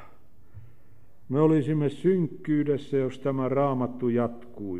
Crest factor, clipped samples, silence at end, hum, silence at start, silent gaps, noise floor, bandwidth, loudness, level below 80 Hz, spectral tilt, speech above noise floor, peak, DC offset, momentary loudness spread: 18 dB; under 0.1%; 0 s; none; 0 s; none; -59 dBFS; 10 kHz; -26 LUFS; -62 dBFS; -9.5 dB/octave; 33 dB; -8 dBFS; 0.8%; 6 LU